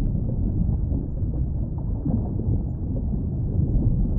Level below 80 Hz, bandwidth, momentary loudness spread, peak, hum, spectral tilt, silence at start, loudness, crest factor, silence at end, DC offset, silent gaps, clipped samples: -28 dBFS; 1.6 kHz; 5 LU; -10 dBFS; none; -16.5 dB/octave; 0 s; -26 LUFS; 12 dB; 0 s; under 0.1%; none; under 0.1%